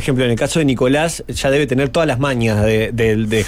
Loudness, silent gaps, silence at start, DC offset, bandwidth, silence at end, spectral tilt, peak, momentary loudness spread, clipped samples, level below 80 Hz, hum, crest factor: -16 LUFS; none; 0 s; under 0.1%; 16 kHz; 0 s; -5.5 dB/octave; -4 dBFS; 2 LU; under 0.1%; -34 dBFS; none; 10 dB